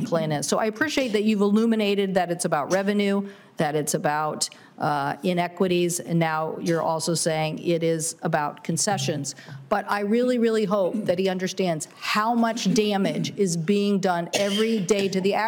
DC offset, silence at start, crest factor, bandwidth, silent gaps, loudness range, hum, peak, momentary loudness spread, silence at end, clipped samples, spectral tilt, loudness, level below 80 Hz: under 0.1%; 0 s; 14 dB; 19 kHz; none; 2 LU; none; -10 dBFS; 5 LU; 0 s; under 0.1%; -4.5 dB/octave; -24 LUFS; -66 dBFS